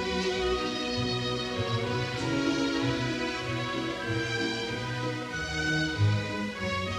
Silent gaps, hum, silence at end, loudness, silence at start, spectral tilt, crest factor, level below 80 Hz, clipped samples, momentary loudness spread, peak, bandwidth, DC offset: none; none; 0 s; -30 LUFS; 0 s; -5 dB/octave; 14 dB; -48 dBFS; under 0.1%; 5 LU; -16 dBFS; 13 kHz; under 0.1%